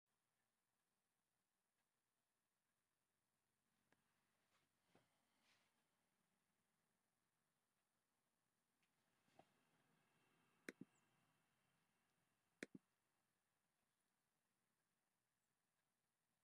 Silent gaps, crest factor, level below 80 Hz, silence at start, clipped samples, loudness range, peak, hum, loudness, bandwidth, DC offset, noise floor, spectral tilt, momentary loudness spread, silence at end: none; 38 dB; under -90 dBFS; 3.7 s; under 0.1%; 2 LU; -36 dBFS; none; -63 LUFS; 4.5 kHz; under 0.1%; under -90 dBFS; -3.5 dB/octave; 7 LU; 0.6 s